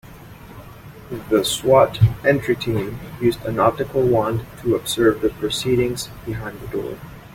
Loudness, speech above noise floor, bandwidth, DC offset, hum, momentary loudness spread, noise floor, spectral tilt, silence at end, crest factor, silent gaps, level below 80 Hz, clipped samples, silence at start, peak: -20 LUFS; 20 dB; 16.5 kHz; under 0.1%; none; 18 LU; -40 dBFS; -5.5 dB/octave; 0 s; 18 dB; none; -42 dBFS; under 0.1%; 0.05 s; -2 dBFS